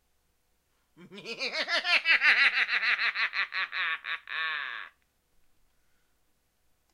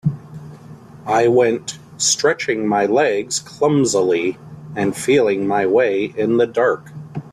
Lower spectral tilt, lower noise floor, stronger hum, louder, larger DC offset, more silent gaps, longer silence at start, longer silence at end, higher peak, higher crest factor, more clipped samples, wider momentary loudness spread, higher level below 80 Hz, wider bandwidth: second, 0 dB/octave vs -4 dB/octave; first, -72 dBFS vs -39 dBFS; neither; second, -26 LUFS vs -17 LUFS; neither; neither; first, 1 s vs 0.05 s; first, 2.05 s vs 0.05 s; second, -8 dBFS vs -4 dBFS; first, 22 dB vs 14 dB; neither; second, 14 LU vs 17 LU; second, -76 dBFS vs -56 dBFS; about the same, 15 kHz vs 14 kHz